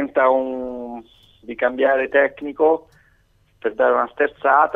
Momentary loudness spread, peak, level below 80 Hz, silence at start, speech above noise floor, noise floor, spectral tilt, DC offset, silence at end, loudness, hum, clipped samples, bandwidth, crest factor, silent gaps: 14 LU; -2 dBFS; -58 dBFS; 0 s; 40 dB; -59 dBFS; -6.5 dB/octave; under 0.1%; 0 s; -19 LUFS; none; under 0.1%; 3.9 kHz; 18 dB; none